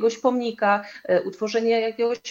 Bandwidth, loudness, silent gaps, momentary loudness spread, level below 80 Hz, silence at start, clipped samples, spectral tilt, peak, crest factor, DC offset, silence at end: 7.4 kHz; -23 LUFS; none; 3 LU; -74 dBFS; 0 s; under 0.1%; -4.5 dB/octave; -6 dBFS; 16 dB; under 0.1%; 0 s